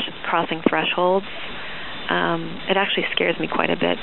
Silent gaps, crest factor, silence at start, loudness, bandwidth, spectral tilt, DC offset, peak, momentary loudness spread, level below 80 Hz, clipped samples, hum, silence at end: none; 22 dB; 0 s; -22 LUFS; 4.3 kHz; -2 dB/octave; 2%; -2 dBFS; 11 LU; -54 dBFS; under 0.1%; none; 0 s